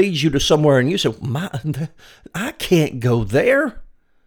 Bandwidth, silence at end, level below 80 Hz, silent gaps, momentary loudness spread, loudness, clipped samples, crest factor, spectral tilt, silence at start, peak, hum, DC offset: over 20 kHz; 0.45 s; -40 dBFS; none; 12 LU; -18 LUFS; under 0.1%; 16 dB; -5.5 dB/octave; 0 s; -2 dBFS; none; under 0.1%